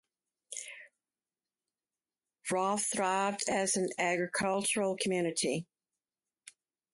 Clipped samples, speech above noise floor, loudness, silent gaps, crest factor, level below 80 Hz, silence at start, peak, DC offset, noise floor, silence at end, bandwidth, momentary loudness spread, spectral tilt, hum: under 0.1%; over 58 dB; -32 LUFS; none; 18 dB; -76 dBFS; 0.5 s; -18 dBFS; under 0.1%; under -90 dBFS; 1.3 s; 12 kHz; 13 LU; -3 dB/octave; none